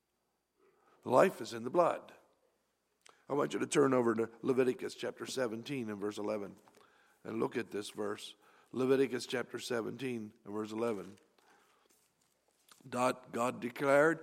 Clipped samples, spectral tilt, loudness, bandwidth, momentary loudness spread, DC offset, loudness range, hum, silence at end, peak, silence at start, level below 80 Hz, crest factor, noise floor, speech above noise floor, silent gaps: under 0.1%; -5 dB/octave; -35 LUFS; 16 kHz; 15 LU; under 0.1%; 7 LU; none; 0 s; -12 dBFS; 1.05 s; -86 dBFS; 24 dB; -82 dBFS; 48 dB; none